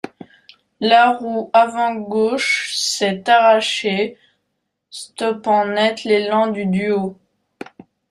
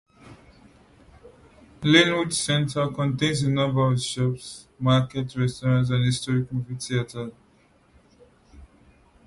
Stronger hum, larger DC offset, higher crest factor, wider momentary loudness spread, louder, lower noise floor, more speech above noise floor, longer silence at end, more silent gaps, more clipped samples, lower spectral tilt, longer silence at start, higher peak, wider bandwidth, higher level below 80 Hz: neither; neither; about the same, 18 dB vs 22 dB; first, 20 LU vs 12 LU; first, -17 LUFS vs -23 LUFS; first, -74 dBFS vs -59 dBFS; first, 57 dB vs 36 dB; first, 1 s vs 0.6 s; neither; neither; second, -3.5 dB/octave vs -5 dB/octave; second, 0.05 s vs 0.25 s; first, 0 dBFS vs -4 dBFS; first, 14.5 kHz vs 11.5 kHz; second, -64 dBFS vs -54 dBFS